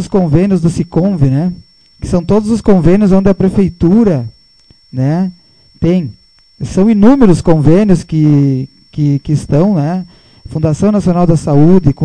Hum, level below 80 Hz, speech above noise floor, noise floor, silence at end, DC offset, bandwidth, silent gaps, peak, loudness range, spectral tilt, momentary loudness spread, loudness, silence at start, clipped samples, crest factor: none; -30 dBFS; 37 dB; -46 dBFS; 0 s; under 0.1%; 10 kHz; none; 0 dBFS; 4 LU; -8.5 dB/octave; 11 LU; -11 LUFS; 0 s; 0.7%; 10 dB